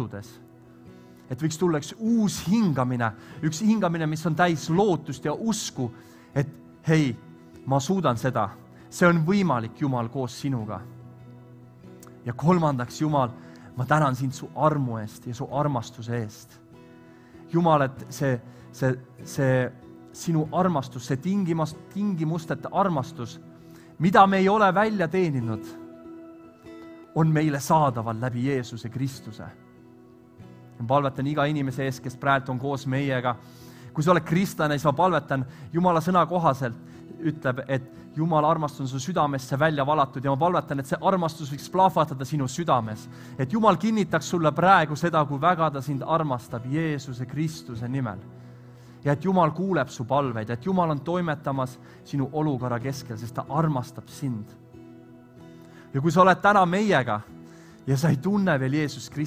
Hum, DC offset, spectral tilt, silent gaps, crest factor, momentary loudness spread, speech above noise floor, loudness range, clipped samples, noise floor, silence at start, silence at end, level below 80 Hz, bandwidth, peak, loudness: none; under 0.1%; -6.5 dB/octave; none; 22 dB; 14 LU; 26 dB; 6 LU; under 0.1%; -51 dBFS; 0 s; 0 s; -58 dBFS; 16 kHz; -4 dBFS; -25 LUFS